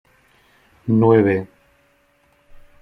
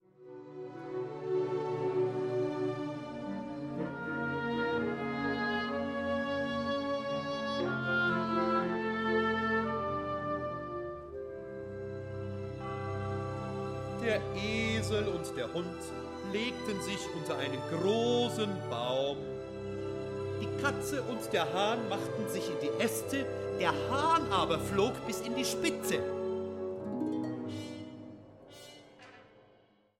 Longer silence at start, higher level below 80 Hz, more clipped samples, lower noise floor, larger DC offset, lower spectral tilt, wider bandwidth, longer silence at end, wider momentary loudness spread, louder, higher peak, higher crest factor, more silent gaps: first, 0.85 s vs 0.2 s; about the same, -56 dBFS vs -60 dBFS; neither; second, -59 dBFS vs -66 dBFS; neither; first, -10.5 dB/octave vs -5 dB/octave; second, 4.7 kHz vs 16 kHz; first, 1.35 s vs 0.6 s; first, 19 LU vs 11 LU; first, -17 LUFS vs -34 LUFS; first, -2 dBFS vs -14 dBFS; about the same, 18 dB vs 20 dB; neither